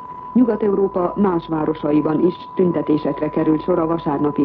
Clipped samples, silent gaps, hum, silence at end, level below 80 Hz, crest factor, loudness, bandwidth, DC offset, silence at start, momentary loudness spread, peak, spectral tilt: under 0.1%; none; none; 0 s; -48 dBFS; 14 dB; -19 LUFS; 5 kHz; under 0.1%; 0 s; 4 LU; -4 dBFS; -11.5 dB/octave